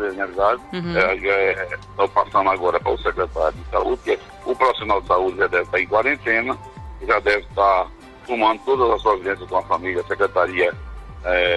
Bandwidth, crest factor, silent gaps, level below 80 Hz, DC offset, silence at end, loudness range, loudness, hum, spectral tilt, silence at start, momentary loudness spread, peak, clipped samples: 11.5 kHz; 16 dB; none; -40 dBFS; under 0.1%; 0 s; 1 LU; -20 LUFS; none; -5.5 dB/octave; 0 s; 8 LU; -4 dBFS; under 0.1%